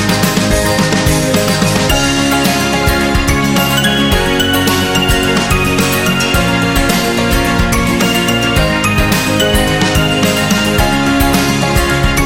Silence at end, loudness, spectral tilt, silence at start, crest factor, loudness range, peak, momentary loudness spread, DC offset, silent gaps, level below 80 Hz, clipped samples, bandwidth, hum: 0 s; -11 LUFS; -4 dB/octave; 0 s; 12 dB; 0 LU; 0 dBFS; 1 LU; 0.6%; none; -22 dBFS; under 0.1%; 17 kHz; none